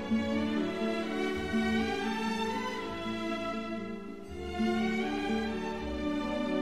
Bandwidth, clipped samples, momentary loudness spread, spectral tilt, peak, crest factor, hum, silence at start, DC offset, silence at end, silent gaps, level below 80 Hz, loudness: 13.5 kHz; under 0.1%; 7 LU; -5.5 dB/octave; -18 dBFS; 14 dB; none; 0 s; 0.3%; 0 s; none; -52 dBFS; -33 LUFS